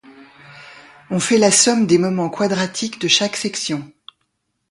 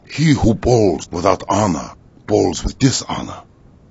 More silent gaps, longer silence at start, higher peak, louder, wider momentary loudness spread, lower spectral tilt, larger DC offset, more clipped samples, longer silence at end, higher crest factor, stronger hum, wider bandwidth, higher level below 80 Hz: neither; about the same, 0.1 s vs 0.1 s; about the same, 0 dBFS vs 0 dBFS; about the same, -17 LUFS vs -17 LUFS; about the same, 11 LU vs 12 LU; second, -3 dB/octave vs -5.5 dB/octave; neither; neither; first, 0.85 s vs 0.5 s; about the same, 20 dB vs 18 dB; neither; first, 11.5 kHz vs 8 kHz; second, -60 dBFS vs -34 dBFS